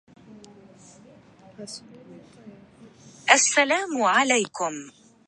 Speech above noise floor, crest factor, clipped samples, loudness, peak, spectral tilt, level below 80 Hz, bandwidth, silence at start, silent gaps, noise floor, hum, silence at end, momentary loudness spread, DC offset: 28 dB; 24 dB; under 0.1%; -21 LUFS; -2 dBFS; -1 dB/octave; -74 dBFS; 11.5 kHz; 0.3 s; none; -51 dBFS; none; 0.4 s; 22 LU; under 0.1%